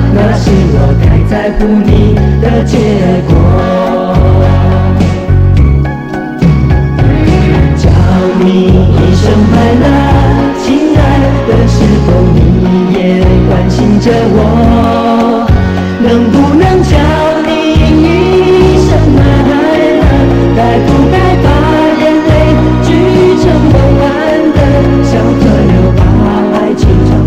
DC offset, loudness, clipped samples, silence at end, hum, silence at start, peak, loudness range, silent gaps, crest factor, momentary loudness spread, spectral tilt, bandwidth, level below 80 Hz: under 0.1%; -7 LUFS; 0.4%; 0 s; none; 0 s; 0 dBFS; 1 LU; none; 6 dB; 3 LU; -8 dB/octave; 10 kHz; -14 dBFS